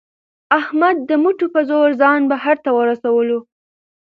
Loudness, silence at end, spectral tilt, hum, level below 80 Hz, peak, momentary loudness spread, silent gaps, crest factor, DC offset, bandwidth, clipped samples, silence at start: -16 LUFS; 0.7 s; -6.5 dB/octave; none; -70 dBFS; 0 dBFS; 4 LU; none; 16 dB; under 0.1%; 5.2 kHz; under 0.1%; 0.5 s